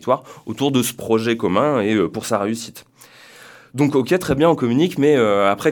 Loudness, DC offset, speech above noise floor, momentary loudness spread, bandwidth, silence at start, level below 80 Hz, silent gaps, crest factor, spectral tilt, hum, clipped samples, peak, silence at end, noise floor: -18 LUFS; under 0.1%; 28 dB; 8 LU; 19 kHz; 0 s; -50 dBFS; none; 18 dB; -5.5 dB/octave; none; under 0.1%; -2 dBFS; 0 s; -46 dBFS